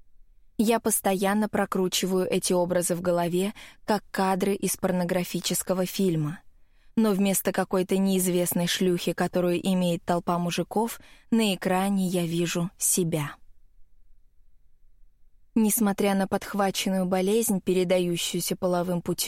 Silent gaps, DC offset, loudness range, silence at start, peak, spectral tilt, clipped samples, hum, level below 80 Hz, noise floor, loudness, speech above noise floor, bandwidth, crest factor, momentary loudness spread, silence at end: none; under 0.1%; 4 LU; 0.2 s; -10 dBFS; -4.5 dB/octave; under 0.1%; none; -56 dBFS; -54 dBFS; -25 LUFS; 29 dB; 16.5 kHz; 16 dB; 5 LU; 0 s